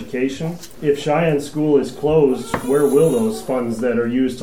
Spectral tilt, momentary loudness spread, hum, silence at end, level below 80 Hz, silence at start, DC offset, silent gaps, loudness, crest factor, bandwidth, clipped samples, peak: -6.5 dB/octave; 8 LU; none; 0 s; -46 dBFS; 0 s; 0.9%; none; -18 LUFS; 14 dB; 17 kHz; under 0.1%; -4 dBFS